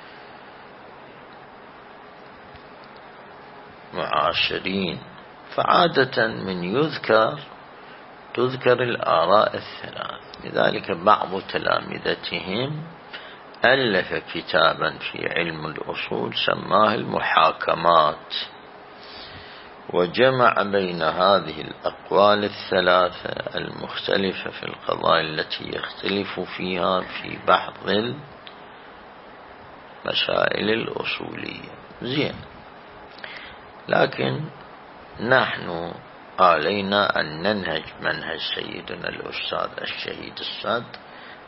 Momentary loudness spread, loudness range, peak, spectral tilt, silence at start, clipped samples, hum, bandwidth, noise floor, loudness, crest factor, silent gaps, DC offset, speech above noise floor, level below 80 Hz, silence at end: 25 LU; 6 LU; -2 dBFS; -9 dB/octave; 0 s; under 0.1%; none; 5.8 kHz; -44 dBFS; -22 LUFS; 22 dB; none; under 0.1%; 21 dB; -58 dBFS; 0 s